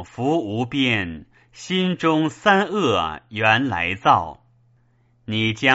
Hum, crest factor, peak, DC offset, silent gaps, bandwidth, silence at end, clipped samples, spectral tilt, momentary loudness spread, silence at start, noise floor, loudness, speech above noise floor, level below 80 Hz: none; 20 dB; -2 dBFS; under 0.1%; none; 8 kHz; 0 s; under 0.1%; -3 dB/octave; 11 LU; 0 s; -60 dBFS; -20 LUFS; 39 dB; -52 dBFS